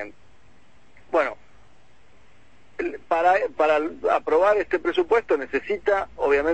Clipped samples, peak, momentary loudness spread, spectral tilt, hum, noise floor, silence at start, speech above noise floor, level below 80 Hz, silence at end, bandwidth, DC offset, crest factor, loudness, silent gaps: under 0.1%; -8 dBFS; 11 LU; -5 dB/octave; none; -57 dBFS; 0 s; 36 dB; -56 dBFS; 0 s; 8.6 kHz; 0.5%; 16 dB; -23 LUFS; none